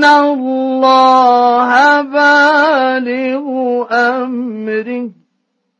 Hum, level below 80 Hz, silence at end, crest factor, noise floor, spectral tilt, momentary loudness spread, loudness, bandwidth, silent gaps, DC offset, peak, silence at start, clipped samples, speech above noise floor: none; -66 dBFS; 0.7 s; 10 dB; -67 dBFS; -3.5 dB/octave; 11 LU; -11 LUFS; 9.8 kHz; none; under 0.1%; 0 dBFS; 0 s; under 0.1%; 55 dB